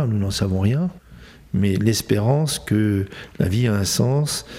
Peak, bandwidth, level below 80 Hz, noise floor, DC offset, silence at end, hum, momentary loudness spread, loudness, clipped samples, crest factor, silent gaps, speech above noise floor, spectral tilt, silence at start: -4 dBFS; 16 kHz; -46 dBFS; -44 dBFS; under 0.1%; 0 s; none; 6 LU; -21 LUFS; under 0.1%; 16 dB; none; 24 dB; -5.5 dB/octave; 0 s